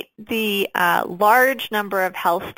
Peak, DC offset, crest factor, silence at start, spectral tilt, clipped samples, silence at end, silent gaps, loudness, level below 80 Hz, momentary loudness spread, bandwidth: -2 dBFS; under 0.1%; 18 dB; 0.2 s; -3.5 dB/octave; under 0.1%; 0.05 s; none; -19 LUFS; -60 dBFS; 8 LU; 17 kHz